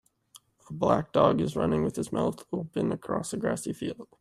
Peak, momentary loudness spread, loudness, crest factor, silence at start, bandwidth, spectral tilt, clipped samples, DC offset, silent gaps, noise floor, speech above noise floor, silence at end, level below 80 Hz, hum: -8 dBFS; 11 LU; -29 LUFS; 20 dB; 0.35 s; 14.5 kHz; -6.5 dB/octave; under 0.1%; under 0.1%; none; -58 dBFS; 30 dB; 0.15 s; -56 dBFS; none